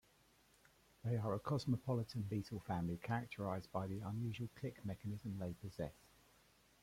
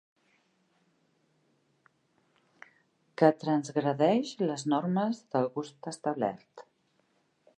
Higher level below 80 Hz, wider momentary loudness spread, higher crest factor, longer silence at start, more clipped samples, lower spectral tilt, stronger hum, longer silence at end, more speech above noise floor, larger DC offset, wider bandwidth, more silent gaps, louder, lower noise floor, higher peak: first, -68 dBFS vs -84 dBFS; second, 8 LU vs 11 LU; second, 18 dB vs 24 dB; second, 1.05 s vs 3.2 s; neither; about the same, -7.5 dB/octave vs -6.5 dB/octave; neither; about the same, 0.9 s vs 0.95 s; second, 29 dB vs 43 dB; neither; first, 16 kHz vs 10.5 kHz; neither; second, -44 LUFS vs -30 LUFS; about the same, -72 dBFS vs -72 dBFS; second, -26 dBFS vs -8 dBFS